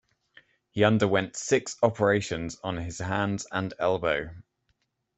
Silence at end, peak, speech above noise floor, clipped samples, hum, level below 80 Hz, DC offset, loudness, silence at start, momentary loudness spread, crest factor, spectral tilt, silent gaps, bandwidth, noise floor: 0.75 s; -6 dBFS; 48 dB; under 0.1%; none; -56 dBFS; under 0.1%; -27 LUFS; 0.75 s; 10 LU; 22 dB; -5 dB/octave; none; 8.4 kHz; -75 dBFS